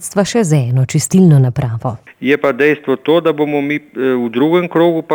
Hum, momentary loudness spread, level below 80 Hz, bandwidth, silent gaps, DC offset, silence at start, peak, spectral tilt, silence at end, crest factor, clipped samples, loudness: none; 9 LU; -50 dBFS; 17.5 kHz; none; under 0.1%; 0 s; -2 dBFS; -6.5 dB/octave; 0 s; 12 dB; under 0.1%; -13 LUFS